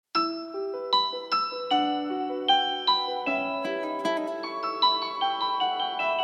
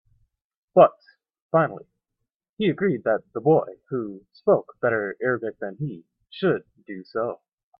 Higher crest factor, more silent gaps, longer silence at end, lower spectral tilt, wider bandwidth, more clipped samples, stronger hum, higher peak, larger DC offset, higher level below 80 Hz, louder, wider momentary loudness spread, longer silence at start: about the same, 18 dB vs 22 dB; second, none vs 1.42-1.49 s, 2.36-2.40 s, 2.49-2.57 s; second, 0 s vs 0.45 s; second, -3 dB/octave vs -11 dB/octave; first, 10.5 kHz vs 5.4 kHz; neither; neither; second, -10 dBFS vs -2 dBFS; neither; second, -88 dBFS vs -68 dBFS; about the same, -26 LUFS vs -24 LUFS; second, 7 LU vs 17 LU; second, 0.15 s vs 0.75 s